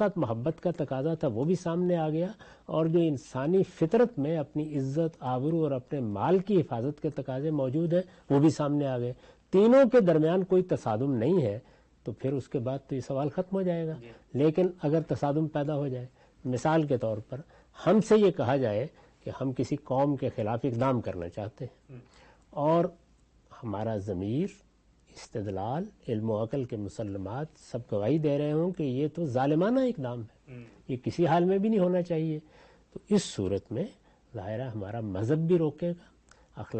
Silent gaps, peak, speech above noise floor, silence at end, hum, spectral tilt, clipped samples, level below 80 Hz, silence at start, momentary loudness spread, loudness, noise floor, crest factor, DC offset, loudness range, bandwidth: none; -12 dBFS; 34 dB; 0 s; none; -8 dB/octave; under 0.1%; -62 dBFS; 0 s; 14 LU; -29 LUFS; -62 dBFS; 16 dB; under 0.1%; 8 LU; 8.4 kHz